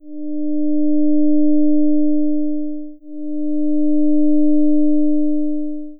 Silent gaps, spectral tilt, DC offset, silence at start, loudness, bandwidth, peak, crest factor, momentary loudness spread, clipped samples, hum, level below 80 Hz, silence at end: none; -17 dB/octave; under 0.1%; 0.05 s; -18 LUFS; 0.7 kHz; -6 dBFS; 8 dB; 11 LU; under 0.1%; none; -66 dBFS; 0.05 s